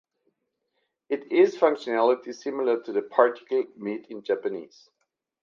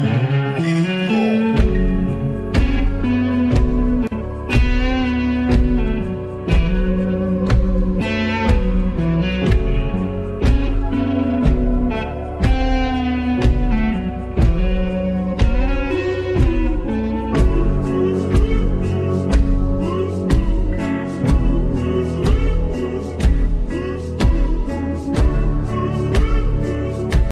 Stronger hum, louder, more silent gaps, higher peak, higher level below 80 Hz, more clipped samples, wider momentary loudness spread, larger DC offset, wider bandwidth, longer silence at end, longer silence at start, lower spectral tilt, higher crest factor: neither; second, -25 LUFS vs -19 LUFS; neither; about the same, -4 dBFS vs -2 dBFS; second, -82 dBFS vs -20 dBFS; neither; first, 12 LU vs 5 LU; neither; second, 7.2 kHz vs 9.4 kHz; first, 0.8 s vs 0 s; first, 1.1 s vs 0 s; second, -5.5 dB/octave vs -8 dB/octave; first, 22 dB vs 14 dB